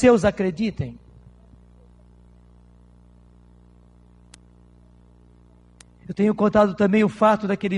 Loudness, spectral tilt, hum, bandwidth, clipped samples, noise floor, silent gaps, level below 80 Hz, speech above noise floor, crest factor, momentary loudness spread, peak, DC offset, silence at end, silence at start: -20 LUFS; -7 dB/octave; 60 Hz at -50 dBFS; 10.5 kHz; under 0.1%; -52 dBFS; none; -50 dBFS; 33 dB; 20 dB; 12 LU; -4 dBFS; under 0.1%; 0 s; 0 s